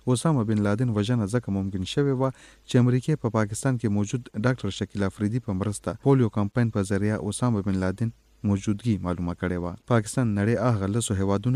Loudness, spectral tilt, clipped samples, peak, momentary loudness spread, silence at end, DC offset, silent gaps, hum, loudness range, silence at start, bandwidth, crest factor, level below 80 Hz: -26 LUFS; -6.5 dB/octave; under 0.1%; -8 dBFS; 6 LU; 0 s; under 0.1%; none; none; 2 LU; 0.05 s; 13 kHz; 16 dB; -52 dBFS